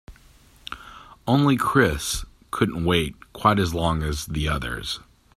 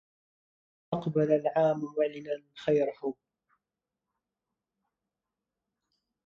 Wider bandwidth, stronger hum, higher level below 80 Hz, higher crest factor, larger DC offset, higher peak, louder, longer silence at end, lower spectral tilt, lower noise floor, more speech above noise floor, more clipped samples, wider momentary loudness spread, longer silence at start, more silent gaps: first, 15 kHz vs 7.2 kHz; neither; first, -38 dBFS vs -74 dBFS; about the same, 22 dB vs 20 dB; neither; first, -2 dBFS vs -14 dBFS; first, -23 LUFS vs -30 LUFS; second, 0.35 s vs 3.15 s; second, -5 dB/octave vs -8 dB/octave; second, -53 dBFS vs -89 dBFS; second, 30 dB vs 60 dB; neither; first, 18 LU vs 12 LU; second, 0.1 s vs 0.9 s; neither